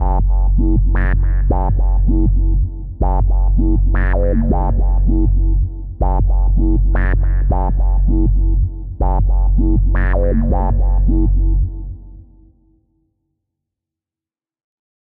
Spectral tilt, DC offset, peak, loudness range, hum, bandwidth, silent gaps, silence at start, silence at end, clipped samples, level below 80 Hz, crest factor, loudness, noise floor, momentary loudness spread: -13 dB/octave; under 0.1%; -2 dBFS; 4 LU; none; 2.4 kHz; none; 0 s; 2.8 s; under 0.1%; -14 dBFS; 12 dB; -17 LUFS; under -90 dBFS; 5 LU